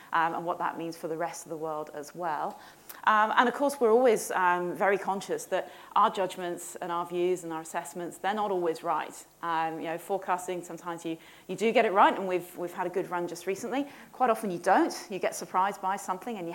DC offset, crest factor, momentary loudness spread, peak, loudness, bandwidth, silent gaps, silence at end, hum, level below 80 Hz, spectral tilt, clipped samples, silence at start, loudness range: under 0.1%; 22 dB; 13 LU; -6 dBFS; -29 LUFS; 17 kHz; none; 0 s; none; -78 dBFS; -4 dB/octave; under 0.1%; 0 s; 6 LU